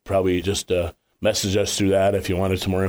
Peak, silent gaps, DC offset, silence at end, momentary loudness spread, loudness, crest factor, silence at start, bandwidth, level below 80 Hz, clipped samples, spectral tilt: -8 dBFS; none; under 0.1%; 0 s; 6 LU; -22 LUFS; 12 dB; 0.05 s; over 20 kHz; -44 dBFS; under 0.1%; -4.5 dB/octave